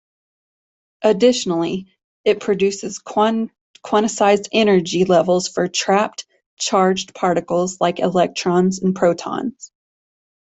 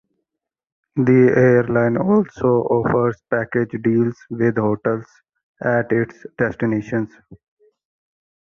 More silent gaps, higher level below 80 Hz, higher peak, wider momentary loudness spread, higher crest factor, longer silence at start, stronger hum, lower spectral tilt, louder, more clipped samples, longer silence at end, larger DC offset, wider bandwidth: first, 2.04-2.24 s, 3.61-3.74 s, 6.46-6.57 s vs 5.43-5.54 s; second, -60 dBFS vs -52 dBFS; about the same, -2 dBFS vs -2 dBFS; about the same, 9 LU vs 11 LU; about the same, 16 dB vs 16 dB; about the same, 1 s vs 0.95 s; neither; second, -4.5 dB/octave vs -10 dB/octave; about the same, -18 LUFS vs -19 LUFS; neither; second, 0.8 s vs 1.15 s; neither; first, 8.4 kHz vs 6.8 kHz